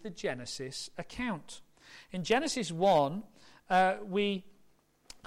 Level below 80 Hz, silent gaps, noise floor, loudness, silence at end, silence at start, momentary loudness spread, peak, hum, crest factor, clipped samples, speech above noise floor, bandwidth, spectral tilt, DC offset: -62 dBFS; none; -66 dBFS; -32 LUFS; 0 s; 0 s; 15 LU; -16 dBFS; none; 16 dB; under 0.1%; 34 dB; 15.5 kHz; -4.5 dB/octave; under 0.1%